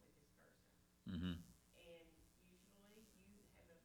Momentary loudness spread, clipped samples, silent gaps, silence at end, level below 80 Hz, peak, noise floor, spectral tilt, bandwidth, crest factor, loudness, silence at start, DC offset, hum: 21 LU; under 0.1%; none; 0.05 s; -72 dBFS; -36 dBFS; -75 dBFS; -6 dB/octave; 19.5 kHz; 22 dB; -52 LUFS; 0 s; under 0.1%; none